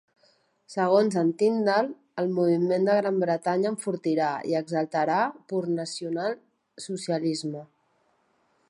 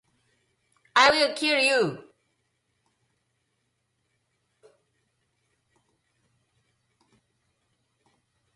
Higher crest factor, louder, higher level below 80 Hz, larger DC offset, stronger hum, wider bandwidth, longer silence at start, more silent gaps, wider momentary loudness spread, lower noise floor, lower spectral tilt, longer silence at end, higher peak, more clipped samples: second, 18 dB vs 24 dB; second, -26 LUFS vs -21 LUFS; second, -80 dBFS vs -70 dBFS; neither; neither; about the same, 11.5 kHz vs 11.5 kHz; second, 0.7 s vs 0.95 s; neither; about the same, 10 LU vs 10 LU; second, -69 dBFS vs -76 dBFS; first, -6 dB/octave vs -2.5 dB/octave; second, 1.05 s vs 6.55 s; about the same, -8 dBFS vs -6 dBFS; neither